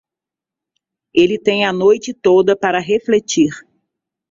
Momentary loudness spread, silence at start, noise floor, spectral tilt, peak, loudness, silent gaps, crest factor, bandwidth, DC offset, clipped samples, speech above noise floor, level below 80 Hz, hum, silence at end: 5 LU; 1.15 s; -87 dBFS; -4.5 dB/octave; 0 dBFS; -15 LUFS; none; 16 dB; 7.6 kHz; under 0.1%; under 0.1%; 73 dB; -58 dBFS; none; 0.7 s